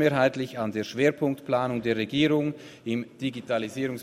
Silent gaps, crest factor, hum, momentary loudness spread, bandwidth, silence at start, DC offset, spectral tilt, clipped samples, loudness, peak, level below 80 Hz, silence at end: none; 18 dB; none; 9 LU; 15 kHz; 0 s; under 0.1%; -6 dB/octave; under 0.1%; -27 LUFS; -8 dBFS; -64 dBFS; 0 s